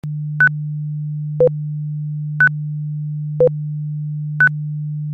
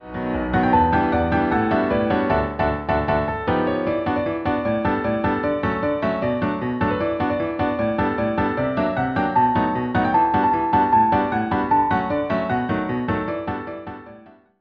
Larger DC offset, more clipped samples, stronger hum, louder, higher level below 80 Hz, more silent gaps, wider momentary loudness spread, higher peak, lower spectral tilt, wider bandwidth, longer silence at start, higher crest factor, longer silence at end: neither; neither; neither; about the same, -19 LUFS vs -21 LUFS; second, -56 dBFS vs -40 dBFS; neither; first, 9 LU vs 6 LU; about the same, -4 dBFS vs -6 dBFS; about the same, -10 dB/octave vs -9.5 dB/octave; second, 3.7 kHz vs 5.8 kHz; about the same, 0.05 s vs 0 s; about the same, 14 dB vs 16 dB; second, 0 s vs 0.3 s